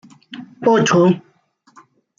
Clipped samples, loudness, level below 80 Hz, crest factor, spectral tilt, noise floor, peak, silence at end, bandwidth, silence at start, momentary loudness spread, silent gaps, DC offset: under 0.1%; -15 LUFS; -64 dBFS; 16 dB; -5.5 dB/octave; -54 dBFS; -4 dBFS; 1 s; 7.4 kHz; 0.3 s; 23 LU; none; under 0.1%